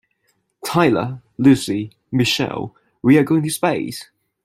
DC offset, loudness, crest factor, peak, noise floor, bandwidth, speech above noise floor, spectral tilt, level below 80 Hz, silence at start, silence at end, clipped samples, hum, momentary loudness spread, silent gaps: under 0.1%; -18 LUFS; 18 dB; -2 dBFS; -67 dBFS; 15.5 kHz; 50 dB; -5.5 dB/octave; -56 dBFS; 0.65 s; 0.4 s; under 0.1%; none; 14 LU; none